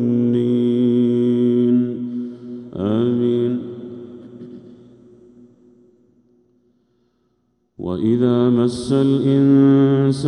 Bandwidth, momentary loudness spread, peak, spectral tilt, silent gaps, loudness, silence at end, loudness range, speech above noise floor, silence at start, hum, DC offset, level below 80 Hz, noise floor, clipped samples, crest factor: 10.5 kHz; 20 LU; -4 dBFS; -8.5 dB/octave; none; -17 LUFS; 0 s; 14 LU; 51 dB; 0 s; none; under 0.1%; -58 dBFS; -66 dBFS; under 0.1%; 14 dB